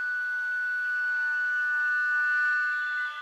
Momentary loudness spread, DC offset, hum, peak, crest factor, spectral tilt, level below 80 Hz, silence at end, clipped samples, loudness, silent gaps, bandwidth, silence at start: 4 LU; under 0.1%; none; -20 dBFS; 8 dB; 4.5 dB/octave; under -90 dBFS; 0 s; under 0.1%; -26 LUFS; none; 12.5 kHz; 0 s